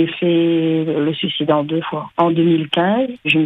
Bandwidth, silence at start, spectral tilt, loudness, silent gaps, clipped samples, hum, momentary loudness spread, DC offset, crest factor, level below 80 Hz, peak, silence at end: 4 kHz; 0 s; -8 dB/octave; -17 LUFS; none; under 0.1%; none; 4 LU; under 0.1%; 14 dB; -62 dBFS; -2 dBFS; 0 s